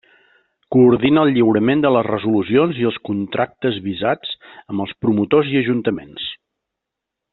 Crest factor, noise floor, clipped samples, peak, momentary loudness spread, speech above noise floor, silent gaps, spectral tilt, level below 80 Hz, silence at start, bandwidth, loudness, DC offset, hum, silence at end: 16 dB; -82 dBFS; under 0.1%; -2 dBFS; 12 LU; 65 dB; none; -5 dB/octave; -56 dBFS; 0.7 s; 4.2 kHz; -17 LUFS; under 0.1%; none; 1 s